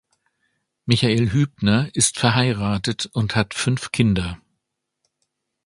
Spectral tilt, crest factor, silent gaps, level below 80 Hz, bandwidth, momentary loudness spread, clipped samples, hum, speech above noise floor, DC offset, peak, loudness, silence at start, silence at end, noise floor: -4.5 dB/octave; 22 dB; none; -44 dBFS; 11.5 kHz; 7 LU; under 0.1%; none; 59 dB; under 0.1%; 0 dBFS; -20 LUFS; 0.85 s; 1.3 s; -78 dBFS